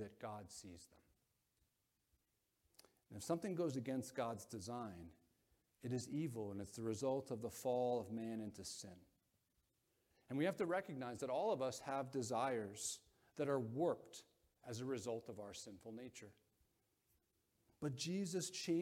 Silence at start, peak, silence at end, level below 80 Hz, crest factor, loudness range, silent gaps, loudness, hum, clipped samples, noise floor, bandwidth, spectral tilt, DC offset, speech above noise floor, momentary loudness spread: 0 s; -26 dBFS; 0 s; -80 dBFS; 20 dB; 9 LU; none; -45 LUFS; none; under 0.1%; -85 dBFS; 16.5 kHz; -5 dB/octave; under 0.1%; 41 dB; 15 LU